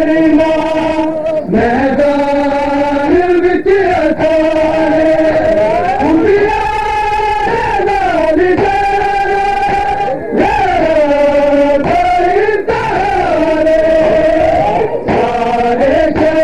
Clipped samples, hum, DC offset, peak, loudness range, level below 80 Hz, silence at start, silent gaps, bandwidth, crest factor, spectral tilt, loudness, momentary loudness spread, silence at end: under 0.1%; none; 2%; 0 dBFS; 1 LU; -30 dBFS; 0 s; none; 11 kHz; 10 dB; -6.5 dB/octave; -11 LUFS; 4 LU; 0 s